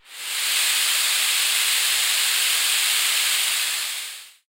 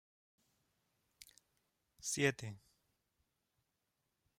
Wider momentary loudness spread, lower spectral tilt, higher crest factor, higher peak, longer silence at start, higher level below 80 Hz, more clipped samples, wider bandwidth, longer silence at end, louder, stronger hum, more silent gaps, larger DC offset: second, 7 LU vs 25 LU; second, 5.5 dB/octave vs -3.5 dB/octave; second, 16 dB vs 28 dB; first, -6 dBFS vs -18 dBFS; second, 0.1 s vs 2 s; about the same, -80 dBFS vs -80 dBFS; neither; about the same, 16 kHz vs 16 kHz; second, 0.2 s vs 1.8 s; first, -18 LUFS vs -38 LUFS; neither; neither; neither